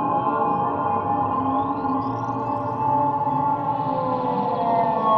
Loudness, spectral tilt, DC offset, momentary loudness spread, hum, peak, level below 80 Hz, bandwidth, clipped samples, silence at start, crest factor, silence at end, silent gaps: -23 LUFS; -9.5 dB/octave; under 0.1%; 4 LU; none; -8 dBFS; -54 dBFS; 6 kHz; under 0.1%; 0 s; 14 dB; 0 s; none